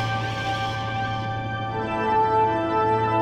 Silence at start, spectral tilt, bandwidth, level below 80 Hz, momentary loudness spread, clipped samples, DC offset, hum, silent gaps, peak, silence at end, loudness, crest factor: 0 s; -6 dB/octave; 9.6 kHz; -46 dBFS; 7 LU; under 0.1%; under 0.1%; none; none; -10 dBFS; 0 s; -24 LUFS; 12 dB